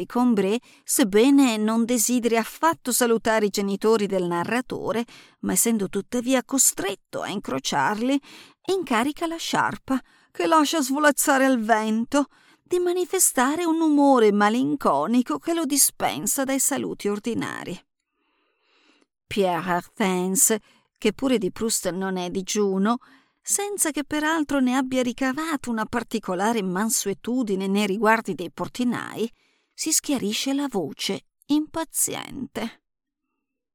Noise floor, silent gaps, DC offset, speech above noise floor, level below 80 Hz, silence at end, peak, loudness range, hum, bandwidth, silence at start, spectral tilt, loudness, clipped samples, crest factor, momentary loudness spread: -83 dBFS; none; under 0.1%; 60 dB; -58 dBFS; 1.05 s; -2 dBFS; 5 LU; none; 19 kHz; 0 s; -3.5 dB/octave; -23 LUFS; under 0.1%; 22 dB; 11 LU